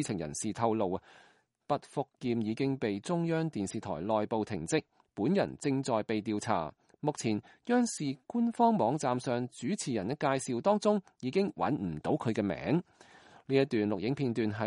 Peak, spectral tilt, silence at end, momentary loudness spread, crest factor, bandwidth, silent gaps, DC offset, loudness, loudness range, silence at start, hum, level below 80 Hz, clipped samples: -14 dBFS; -6 dB/octave; 0 s; 7 LU; 18 dB; 11.5 kHz; none; under 0.1%; -32 LUFS; 3 LU; 0 s; none; -66 dBFS; under 0.1%